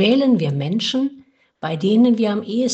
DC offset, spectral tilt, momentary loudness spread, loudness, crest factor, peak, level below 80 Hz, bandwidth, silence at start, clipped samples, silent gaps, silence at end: under 0.1%; -6 dB/octave; 11 LU; -18 LUFS; 14 dB; -4 dBFS; -64 dBFS; 8 kHz; 0 s; under 0.1%; none; 0 s